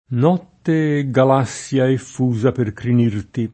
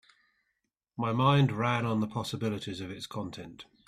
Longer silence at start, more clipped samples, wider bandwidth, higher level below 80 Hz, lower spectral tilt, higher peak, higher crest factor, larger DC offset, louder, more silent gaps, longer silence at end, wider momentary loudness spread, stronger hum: second, 0.1 s vs 1 s; neither; second, 8.8 kHz vs 13.5 kHz; first, -54 dBFS vs -64 dBFS; about the same, -7.5 dB/octave vs -6.5 dB/octave; first, -2 dBFS vs -12 dBFS; about the same, 16 dB vs 18 dB; neither; first, -18 LUFS vs -30 LUFS; neither; second, 0.05 s vs 0.25 s; second, 6 LU vs 17 LU; neither